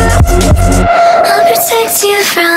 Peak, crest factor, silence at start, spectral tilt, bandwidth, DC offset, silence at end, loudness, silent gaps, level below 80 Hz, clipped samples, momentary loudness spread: 0 dBFS; 8 dB; 0 s; -4 dB/octave; 16.5 kHz; under 0.1%; 0 s; -8 LUFS; none; -16 dBFS; 0.2%; 2 LU